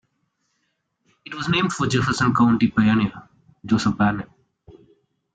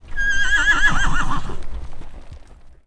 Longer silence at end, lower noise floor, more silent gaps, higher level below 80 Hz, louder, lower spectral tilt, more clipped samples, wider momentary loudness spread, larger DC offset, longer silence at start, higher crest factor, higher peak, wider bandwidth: first, 0.65 s vs 0.15 s; first, -73 dBFS vs -41 dBFS; neither; second, -50 dBFS vs -26 dBFS; about the same, -20 LUFS vs -18 LUFS; first, -5.5 dB/octave vs -2.5 dB/octave; neither; second, 14 LU vs 21 LU; neither; first, 1.3 s vs 0 s; about the same, 16 dB vs 14 dB; second, -6 dBFS vs -2 dBFS; about the same, 9.2 kHz vs 9.6 kHz